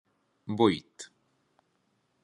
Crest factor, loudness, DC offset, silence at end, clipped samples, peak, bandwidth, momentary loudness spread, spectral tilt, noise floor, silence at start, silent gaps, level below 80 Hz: 24 dB; -28 LUFS; under 0.1%; 1.2 s; under 0.1%; -8 dBFS; 10.5 kHz; 22 LU; -6 dB/octave; -74 dBFS; 0.45 s; none; -72 dBFS